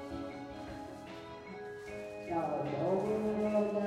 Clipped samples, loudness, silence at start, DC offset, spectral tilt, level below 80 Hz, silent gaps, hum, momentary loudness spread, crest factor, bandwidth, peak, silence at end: under 0.1%; -37 LUFS; 0 s; under 0.1%; -7.5 dB/octave; -64 dBFS; none; none; 15 LU; 16 dB; 13 kHz; -20 dBFS; 0 s